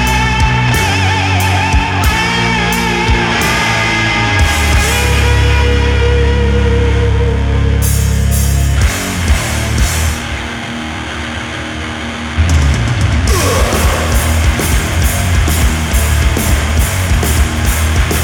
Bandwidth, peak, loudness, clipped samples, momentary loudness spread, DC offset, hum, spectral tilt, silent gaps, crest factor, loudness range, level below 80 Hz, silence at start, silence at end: 18.5 kHz; 0 dBFS; -12 LUFS; under 0.1%; 8 LU; under 0.1%; none; -4.5 dB/octave; none; 12 dB; 5 LU; -16 dBFS; 0 s; 0 s